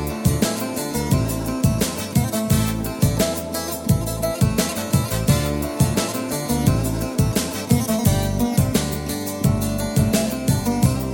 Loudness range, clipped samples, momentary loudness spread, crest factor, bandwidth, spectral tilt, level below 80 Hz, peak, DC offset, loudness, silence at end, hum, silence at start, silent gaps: 1 LU; under 0.1%; 5 LU; 18 dB; 19.5 kHz; -5.5 dB/octave; -34 dBFS; -4 dBFS; under 0.1%; -21 LUFS; 0 s; none; 0 s; none